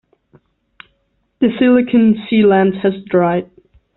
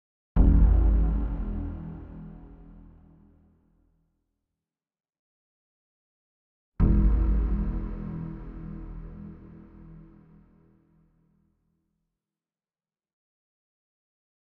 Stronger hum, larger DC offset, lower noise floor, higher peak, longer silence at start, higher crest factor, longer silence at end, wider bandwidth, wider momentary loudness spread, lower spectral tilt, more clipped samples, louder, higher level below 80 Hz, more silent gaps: neither; neither; second, -64 dBFS vs under -90 dBFS; first, -2 dBFS vs -8 dBFS; first, 1.4 s vs 0.35 s; second, 14 dB vs 22 dB; second, 0.5 s vs 4.5 s; first, 4.1 kHz vs 2.4 kHz; second, 7 LU vs 26 LU; second, -6 dB/octave vs -11.5 dB/octave; neither; first, -14 LUFS vs -27 LUFS; second, -54 dBFS vs -30 dBFS; second, none vs 5.19-6.72 s